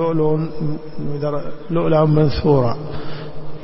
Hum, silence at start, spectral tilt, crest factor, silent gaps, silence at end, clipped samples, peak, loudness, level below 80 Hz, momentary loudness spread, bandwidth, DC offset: none; 0 s; -12 dB/octave; 14 dB; none; 0 s; under 0.1%; -4 dBFS; -19 LUFS; -38 dBFS; 15 LU; 5.8 kHz; under 0.1%